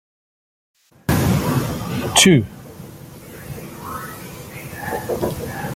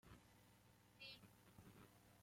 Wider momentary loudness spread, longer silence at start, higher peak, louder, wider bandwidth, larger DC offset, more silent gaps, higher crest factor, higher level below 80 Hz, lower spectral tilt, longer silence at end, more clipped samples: first, 25 LU vs 9 LU; first, 1.1 s vs 0.05 s; first, 0 dBFS vs -44 dBFS; first, -19 LUFS vs -64 LUFS; about the same, 17 kHz vs 16.5 kHz; neither; neither; about the same, 22 dB vs 22 dB; first, -42 dBFS vs -80 dBFS; about the same, -4 dB/octave vs -4 dB/octave; about the same, 0 s vs 0 s; neither